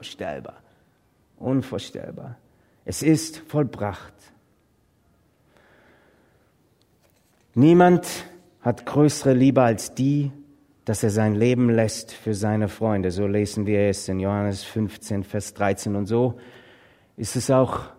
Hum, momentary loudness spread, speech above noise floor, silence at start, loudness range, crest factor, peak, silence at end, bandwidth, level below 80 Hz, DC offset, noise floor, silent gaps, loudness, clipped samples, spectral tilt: none; 16 LU; 42 dB; 0 s; 8 LU; 20 dB; -2 dBFS; 0.05 s; 16 kHz; -56 dBFS; under 0.1%; -63 dBFS; none; -22 LUFS; under 0.1%; -6.5 dB/octave